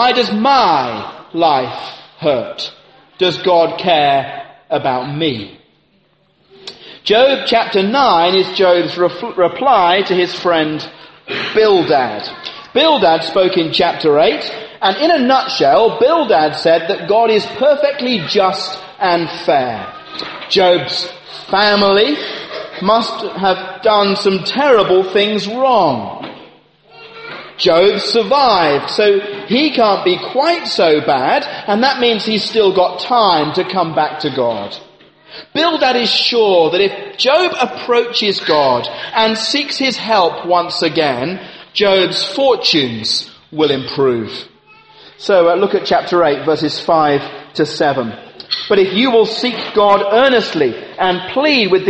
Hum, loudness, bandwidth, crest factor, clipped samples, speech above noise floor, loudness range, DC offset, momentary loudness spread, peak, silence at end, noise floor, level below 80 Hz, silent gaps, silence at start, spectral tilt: none; -13 LUFS; 8.8 kHz; 14 dB; under 0.1%; 42 dB; 3 LU; under 0.1%; 13 LU; 0 dBFS; 0 s; -56 dBFS; -56 dBFS; none; 0 s; -4.5 dB/octave